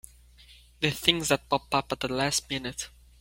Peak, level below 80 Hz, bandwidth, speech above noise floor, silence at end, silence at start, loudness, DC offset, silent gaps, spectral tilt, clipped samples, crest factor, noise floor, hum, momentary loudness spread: -2 dBFS; -54 dBFS; 16.5 kHz; 26 dB; 0.3 s; 0.5 s; -27 LUFS; under 0.1%; none; -3 dB/octave; under 0.1%; 28 dB; -54 dBFS; 60 Hz at -55 dBFS; 11 LU